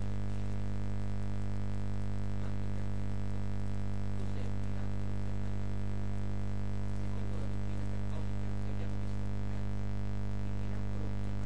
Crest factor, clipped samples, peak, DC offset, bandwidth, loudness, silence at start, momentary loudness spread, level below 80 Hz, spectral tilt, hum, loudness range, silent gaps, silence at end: 10 dB; under 0.1%; -24 dBFS; 2%; 9.6 kHz; -39 LUFS; 0 s; 0 LU; -42 dBFS; -8 dB/octave; 50 Hz at -35 dBFS; 0 LU; none; 0 s